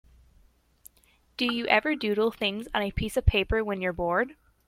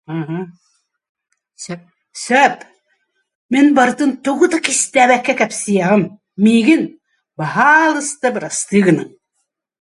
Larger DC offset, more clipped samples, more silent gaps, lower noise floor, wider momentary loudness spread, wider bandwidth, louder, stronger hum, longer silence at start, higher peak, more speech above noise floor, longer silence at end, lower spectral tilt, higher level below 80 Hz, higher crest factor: neither; neither; second, none vs 1.09-1.15 s, 3.35-3.49 s; second, -64 dBFS vs -71 dBFS; second, 6 LU vs 19 LU; first, 16.5 kHz vs 11.5 kHz; second, -27 LUFS vs -14 LUFS; neither; first, 1.4 s vs 0.1 s; second, -6 dBFS vs 0 dBFS; second, 37 dB vs 57 dB; second, 0.35 s vs 0.9 s; first, -5.5 dB/octave vs -4 dB/octave; first, -38 dBFS vs -64 dBFS; first, 22 dB vs 16 dB